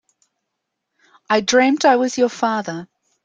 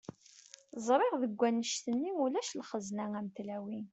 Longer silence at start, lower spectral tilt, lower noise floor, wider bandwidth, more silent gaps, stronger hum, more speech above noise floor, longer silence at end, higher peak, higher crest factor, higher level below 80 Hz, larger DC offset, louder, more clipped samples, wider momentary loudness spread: first, 1.3 s vs 0.35 s; about the same, -3.5 dB/octave vs -4 dB/octave; first, -78 dBFS vs -59 dBFS; first, 9.4 kHz vs 8.2 kHz; neither; neither; first, 61 dB vs 24 dB; first, 0.4 s vs 0.05 s; first, -2 dBFS vs -16 dBFS; about the same, 18 dB vs 20 dB; first, -66 dBFS vs -80 dBFS; neither; first, -17 LUFS vs -35 LUFS; neither; second, 12 LU vs 16 LU